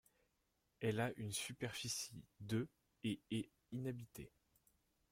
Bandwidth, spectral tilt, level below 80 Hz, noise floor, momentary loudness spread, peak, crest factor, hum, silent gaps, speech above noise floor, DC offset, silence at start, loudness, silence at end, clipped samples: 16.5 kHz; -4.5 dB/octave; -74 dBFS; -84 dBFS; 11 LU; -28 dBFS; 18 dB; none; none; 39 dB; under 0.1%; 0.8 s; -45 LUFS; 0.85 s; under 0.1%